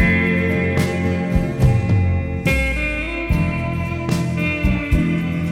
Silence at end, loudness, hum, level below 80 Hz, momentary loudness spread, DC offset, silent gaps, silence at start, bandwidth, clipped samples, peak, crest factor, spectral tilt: 0 s; -19 LUFS; none; -26 dBFS; 5 LU; under 0.1%; none; 0 s; 16 kHz; under 0.1%; -2 dBFS; 16 dB; -7 dB/octave